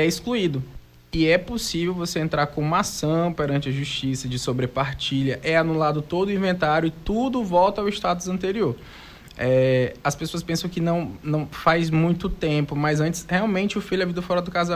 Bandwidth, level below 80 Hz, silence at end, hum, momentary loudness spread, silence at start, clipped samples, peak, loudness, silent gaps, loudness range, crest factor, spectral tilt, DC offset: 16 kHz; -44 dBFS; 0 s; none; 7 LU; 0 s; under 0.1%; -6 dBFS; -23 LUFS; none; 2 LU; 16 dB; -5.5 dB/octave; under 0.1%